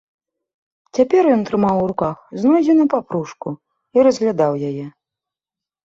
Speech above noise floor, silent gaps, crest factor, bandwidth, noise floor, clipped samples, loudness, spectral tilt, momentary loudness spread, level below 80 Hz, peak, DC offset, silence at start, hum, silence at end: 72 dB; none; 16 dB; 7.8 kHz; -89 dBFS; under 0.1%; -17 LUFS; -7.5 dB/octave; 16 LU; -56 dBFS; -2 dBFS; under 0.1%; 0.95 s; none; 0.95 s